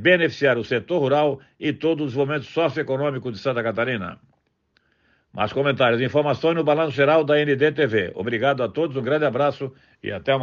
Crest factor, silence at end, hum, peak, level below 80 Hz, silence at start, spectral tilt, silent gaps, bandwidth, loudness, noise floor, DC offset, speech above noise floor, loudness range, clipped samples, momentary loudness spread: 16 dB; 0 s; none; -4 dBFS; -62 dBFS; 0 s; -7 dB/octave; none; 7.2 kHz; -21 LUFS; -67 dBFS; under 0.1%; 46 dB; 6 LU; under 0.1%; 10 LU